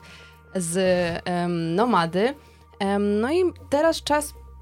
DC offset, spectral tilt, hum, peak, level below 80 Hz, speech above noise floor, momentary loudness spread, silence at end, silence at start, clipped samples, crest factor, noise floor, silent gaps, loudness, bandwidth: under 0.1%; -5 dB/octave; none; -8 dBFS; -50 dBFS; 24 dB; 9 LU; 0 s; 0.05 s; under 0.1%; 16 dB; -47 dBFS; none; -23 LUFS; 16.5 kHz